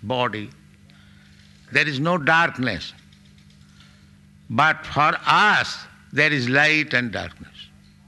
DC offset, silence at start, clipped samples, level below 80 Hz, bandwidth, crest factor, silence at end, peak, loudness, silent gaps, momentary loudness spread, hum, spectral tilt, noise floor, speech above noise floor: under 0.1%; 0 s; under 0.1%; -56 dBFS; 12 kHz; 20 dB; 0.45 s; -4 dBFS; -20 LUFS; none; 18 LU; none; -4.5 dB/octave; -50 dBFS; 30 dB